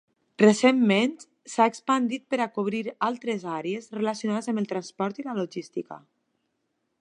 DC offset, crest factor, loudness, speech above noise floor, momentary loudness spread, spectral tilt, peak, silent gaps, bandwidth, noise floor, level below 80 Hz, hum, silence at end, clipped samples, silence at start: under 0.1%; 22 dB; -26 LUFS; 52 dB; 14 LU; -5 dB/octave; -4 dBFS; none; 11 kHz; -77 dBFS; -78 dBFS; none; 1 s; under 0.1%; 0.4 s